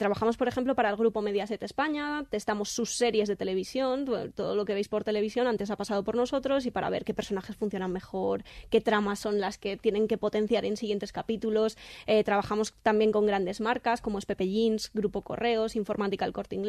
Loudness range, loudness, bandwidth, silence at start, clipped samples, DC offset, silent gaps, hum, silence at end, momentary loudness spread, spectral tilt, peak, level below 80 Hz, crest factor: 2 LU; -29 LUFS; 13.5 kHz; 0 s; under 0.1%; under 0.1%; none; none; 0 s; 7 LU; -5 dB/octave; -12 dBFS; -56 dBFS; 18 dB